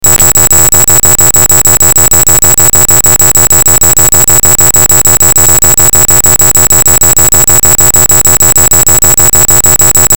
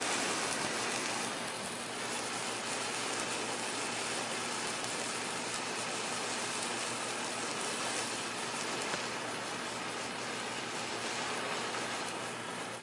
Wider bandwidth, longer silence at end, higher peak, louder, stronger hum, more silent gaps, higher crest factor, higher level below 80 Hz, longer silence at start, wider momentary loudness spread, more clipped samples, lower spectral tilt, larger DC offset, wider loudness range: first, over 20 kHz vs 11.5 kHz; about the same, 0 s vs 0 s; first, 0 dBFS vs -16 dBFS; first, -1 LUFS vs -35 LUFS; neither; neither; second, 6 dB vs 22 dB; first, -20 dBFS vs -76 dBFS; about the same, 0 s vs 0 s; second, 0 LU vs 4 LU; first, 20% vs under 0.1%; about the same, -1.5 dB/octave vs -1.5 dB/octave; first, 20% vs under 0.1%; about the same, 0 LU vs 2 LU